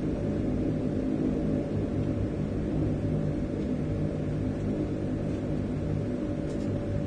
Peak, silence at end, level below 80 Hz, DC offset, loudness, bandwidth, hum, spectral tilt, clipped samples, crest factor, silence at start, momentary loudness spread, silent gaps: -16 dBFS; 0 s; -40 dBFS; under 0.1%; -30 LUFS; 9.4 kHz; none; -9 dB/octave; under 0.1%; 12 dB; 0 s; 2 LU; none